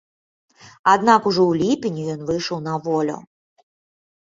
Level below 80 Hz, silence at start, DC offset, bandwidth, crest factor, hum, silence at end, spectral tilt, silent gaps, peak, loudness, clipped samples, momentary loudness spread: -58 dBFS; 0.65 s; under 0.1%; 7.8 kHz; 20 dB; none; 1.1 s; -5.5 dB/octave; 0.79-0.84 s; -2 dBFS; -20 LUFS; under 0.1%; 11 LU